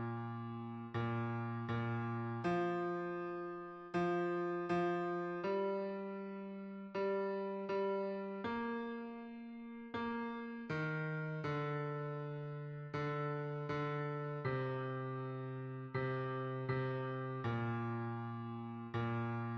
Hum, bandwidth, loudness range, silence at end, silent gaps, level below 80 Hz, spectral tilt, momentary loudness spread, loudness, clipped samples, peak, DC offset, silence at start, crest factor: none; 7.4 kHz; 3 LU; 0 s; none; -74 dBFS; -8.5 dB/octave; 8 LU; -41 LUFS; under 0.1%; -26 dBFS; under 0.1%; 0 s; 14 dB